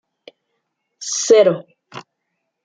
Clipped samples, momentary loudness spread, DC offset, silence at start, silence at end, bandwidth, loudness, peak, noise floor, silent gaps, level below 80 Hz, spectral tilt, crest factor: under 0.1%; 25 LU; under 0.1%; 1 s; 0.65 s; 9.4 kHz; -15 LUFS; -2 dBFS; -75 dBFS; none; -72 dBFS; -3 dB/octave; 18 dB